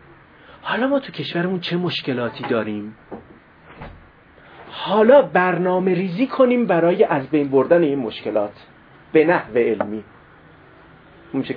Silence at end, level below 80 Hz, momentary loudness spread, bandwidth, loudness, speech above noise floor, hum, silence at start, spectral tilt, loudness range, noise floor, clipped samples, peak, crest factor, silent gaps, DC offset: 0 s; -58 dBFS; 18 LU; 5.2 kHz; -19 LUFS; 29 dB; none; 0.65 s; -8.5 dB/octave; 9 LU; -48 dBFS; under 0.1%; 0 dBFS; 20 dB; none; under 0.1%